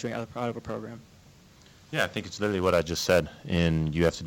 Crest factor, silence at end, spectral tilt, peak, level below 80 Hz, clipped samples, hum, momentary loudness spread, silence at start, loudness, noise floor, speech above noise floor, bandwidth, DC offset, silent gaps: 18 dB; 0 s; -5.5 dB/octave; -10 dBFS; -46 dBFS; under 0.1%; none; 12 LU; 0 s; -28 LUFS; -55 dBFS; 27 dB; 18 kHz; under 0.1%; none